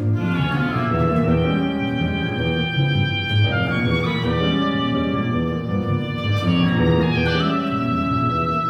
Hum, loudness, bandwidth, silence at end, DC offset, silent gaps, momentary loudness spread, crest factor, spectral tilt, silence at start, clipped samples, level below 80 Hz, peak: none; -20 LUFS; 6.6 kHz; 0 s; under 0.1%; none; 4 LU; 14 dB; -8 dB/octave; 0 s; under 0.1%; -38 dBFS; -6 dBFS